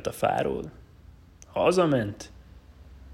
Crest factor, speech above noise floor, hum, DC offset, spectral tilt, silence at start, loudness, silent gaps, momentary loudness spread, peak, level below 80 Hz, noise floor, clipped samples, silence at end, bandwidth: 18 dB; 26 dB; none; under 0.1%; -6 dB/octave; 0 s; -26 LUFS; none; 20 LU; -10 dBFS; -52 dBFS; -51 dBFS; under 0.1%; 0 s; 16 kHz